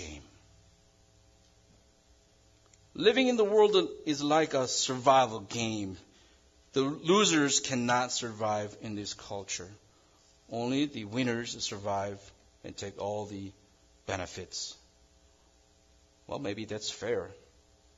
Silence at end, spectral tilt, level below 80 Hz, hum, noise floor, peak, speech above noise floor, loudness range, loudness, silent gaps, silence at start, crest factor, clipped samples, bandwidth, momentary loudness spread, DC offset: 0.65 s; -3.5 dB/octave; -66 dBFS; none; -64 dBFS; -10 dBFS; 34 dB; 13 LU; -30 LUFS; none; 0 s; 22 dB; under 0.1%; 12 kHz; 18 LU; under 0.1%